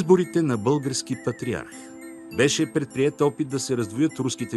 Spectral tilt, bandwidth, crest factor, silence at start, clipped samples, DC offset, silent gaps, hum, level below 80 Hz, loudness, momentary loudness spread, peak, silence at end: -5 dB/octave; 12.5 kHz; 18 dB; 0 s; under 0.1%; under 0.1%; none; none; -60 dBFS; -24 LUFS; 12 LU; -6 dBFS; 0 s